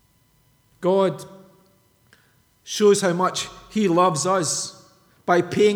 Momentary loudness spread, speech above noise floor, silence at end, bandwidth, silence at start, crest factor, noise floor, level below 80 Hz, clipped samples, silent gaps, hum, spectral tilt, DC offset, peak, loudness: 14 LU; 41 dB; 0 s; 17.5 kHz; 0.8 s; 18 dB; -61 dBFS; -64 dBFS; under 0.1%; none; none; -4 dB/octave; under 0.1%; -4 dBFS; -21 LUFS